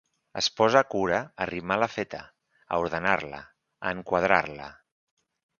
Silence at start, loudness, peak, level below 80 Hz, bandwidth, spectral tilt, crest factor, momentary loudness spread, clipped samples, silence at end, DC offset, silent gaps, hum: 0.35 s; -26 LUFS; -4 dBFS; -58 dBFS; 7.2 kHz; -4 dB/octave; 26 dB; 18 LU; under 0.1%; 0.9 s; under 0.1%; none; none